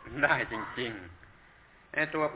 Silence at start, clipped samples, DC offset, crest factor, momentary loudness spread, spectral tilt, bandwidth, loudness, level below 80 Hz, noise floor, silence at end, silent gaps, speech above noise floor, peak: 0 s; under 0.1%; under 0.1%; 22 dB; 15 LU; -2.5 dB/octave; 4 kHz; -31 LUFS; -58 dBFS; -58 dBFS; 0 s; none; 27 dB; -12 dBFS